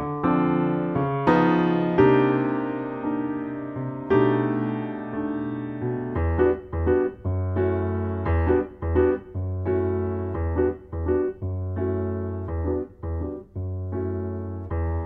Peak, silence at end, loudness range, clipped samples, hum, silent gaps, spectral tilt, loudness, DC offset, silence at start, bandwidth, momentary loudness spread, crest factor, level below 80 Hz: -4 dBFS; 0 s; 6 LU; under 0.1%; none; none; -10.5 dB/octave; -25 LUFS; under 0.1%; 0 s; 4.8 kHz; 11 LU; 20 dB; -38 dBFS